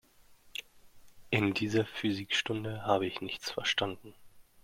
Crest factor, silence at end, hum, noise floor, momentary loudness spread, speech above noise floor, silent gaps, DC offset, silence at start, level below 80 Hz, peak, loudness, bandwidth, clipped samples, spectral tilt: 24 dB; 0.2 s; none; -60 dBFS; 14 LU; 27 dB; none; under 0.1%; 0.3 s; -66 dBFS; -12 dBFS; -33 LUFS; 16.5 kHz; under 0.1%; -4.5 dB/octave